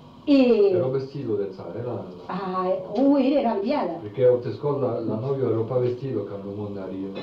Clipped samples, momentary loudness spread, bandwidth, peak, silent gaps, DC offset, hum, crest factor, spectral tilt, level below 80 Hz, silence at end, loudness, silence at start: under 0.1%; 13 LU; 6 kHz; -8 dBFS; none; under 0.1%; none; 14 dB; -9.5 dB/octave; -62 dBFS; 0 s; -24 LUFS; 0 s